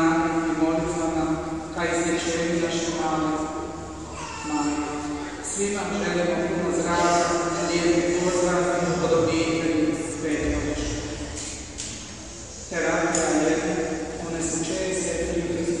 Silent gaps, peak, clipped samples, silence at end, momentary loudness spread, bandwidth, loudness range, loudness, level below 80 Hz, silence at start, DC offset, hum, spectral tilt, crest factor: none; -6 dBFS; under 0.1%; 0 s; 11 LU; 11.5 kHz; 5 LU; -25 LUFS; -42 dBFS; 0 s; 0.2%; none; -4.5 dB/octave; 18 dB